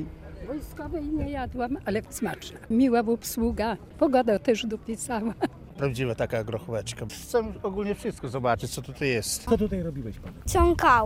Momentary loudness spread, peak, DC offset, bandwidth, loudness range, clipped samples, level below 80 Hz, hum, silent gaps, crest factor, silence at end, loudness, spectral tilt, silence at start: 13 LU; -8 dBFS; under 0.1%; 16 kHz; 4 LU; under 0.1%; -40 dBFS; none; none; 20 dB; 0 s; -28 LUFS; -5 dB/octave; 0 s